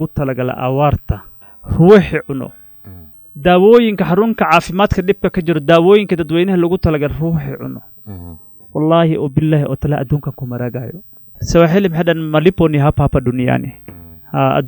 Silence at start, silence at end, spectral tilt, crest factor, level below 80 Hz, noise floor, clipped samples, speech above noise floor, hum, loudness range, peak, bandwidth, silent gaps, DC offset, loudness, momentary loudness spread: 0 s; 0 s; -7.5 dB/octave; 14 dB; -34 dBFS; -36 dBFS; 0.1%; 23 dB; none; 5 LU; 0 dBFS; 19.5 kHz; none; under 0.1%; -14 LUFS; 18 LU